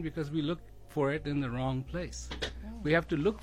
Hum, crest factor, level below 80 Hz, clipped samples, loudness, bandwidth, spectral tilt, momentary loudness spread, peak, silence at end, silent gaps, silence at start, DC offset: none; 18 dB; -48 dBFS; under 0.1%; -34 LUFS; 14.5 kHz; -6 dB/octave; 10 LU; -14 dBFS; 0 s; none; 0 s; under 0.1%